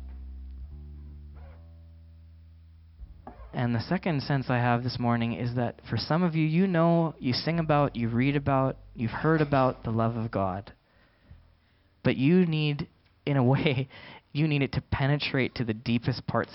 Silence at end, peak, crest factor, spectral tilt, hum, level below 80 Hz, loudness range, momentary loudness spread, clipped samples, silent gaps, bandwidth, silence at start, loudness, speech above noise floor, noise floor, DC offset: 0 s; -8 dBFS; 20 dB; -11 dB/octave; none; -50 dBFS; 8 LU; 20 LU; under 0.1%; none; 5.8 kHz; 0 s; -27 LUFS; 38 dB; -64 dBFS; under 0.1%